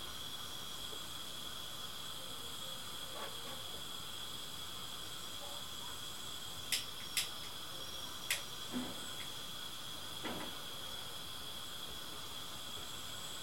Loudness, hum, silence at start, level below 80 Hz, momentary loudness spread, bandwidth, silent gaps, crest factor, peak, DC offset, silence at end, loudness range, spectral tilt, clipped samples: -43 LUFS; none; 0 s; -66 dBFS; 6 LU; 16.5 kHz; none; 28 dB; -18 dBFS; 0.3%; 0 s; 3 LU; -1.5 dB/octave; under 0.1%